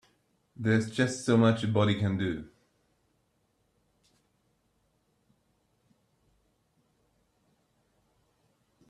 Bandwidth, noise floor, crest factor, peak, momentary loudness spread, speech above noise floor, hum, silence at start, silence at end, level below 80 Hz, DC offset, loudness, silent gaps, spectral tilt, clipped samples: 11 kHz; -74 dBFS; 22 dB; -12 dBFS; 10 LU; 47 dB; none; 0.6 s; 6.45 s; -66 dBFS; under 0.1%; -28 LUFS; none; -6.5 dB/octave; under 0.1%